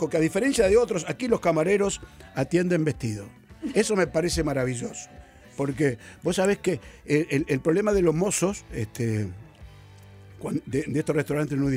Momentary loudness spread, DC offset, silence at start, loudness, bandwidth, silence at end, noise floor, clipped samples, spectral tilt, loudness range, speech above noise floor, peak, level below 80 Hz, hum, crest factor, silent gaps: 13 LU; under 0.1%; 0 s; -25 LUFS; 16 kHz; 0 s; -48 dBFS; under 0.1%; -5.5 dB/octave; 3 LU; 23 dB; -10 dBFS; -46 dBFS; none; 16 dB; none